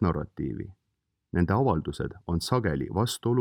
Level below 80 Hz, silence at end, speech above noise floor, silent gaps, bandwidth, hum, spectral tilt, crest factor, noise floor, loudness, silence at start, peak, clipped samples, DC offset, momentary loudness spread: -46 dBFS; 0 s; 23 dB; none; 19 kHz; none; -6.5 dB/octave; 18 dB; -50 dBFS; -28 LUFS; 0 s; -10 dBFS; under 0.1%; under 0.1%; 10 LU